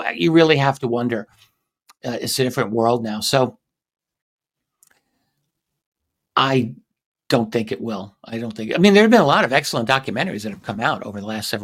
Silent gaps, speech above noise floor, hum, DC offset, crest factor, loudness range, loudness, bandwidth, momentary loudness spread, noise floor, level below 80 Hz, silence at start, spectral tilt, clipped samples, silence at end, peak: 4.22-4.39 s, 5.86-5.92 s, 7.06-7.12 s; 57 dB; none; under 0.1%; 20 dB; 9 LU; -19 LUFS; 16 kHz; 15 LU; -76 dBFS; -60 dBFS; 0 s; -5 dB/octave; under 0.1%; 0 s; -2 dBFS